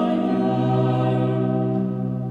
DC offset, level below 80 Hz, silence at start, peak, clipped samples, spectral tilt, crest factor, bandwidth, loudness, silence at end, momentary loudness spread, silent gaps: under 0.1%; -56 dBFS; 0 s; -8 dBFS; under 0.1%; -10 dB/octave; 12 dB; 4.7 kHz; -22 LUFS; 0 s; 4 LU; none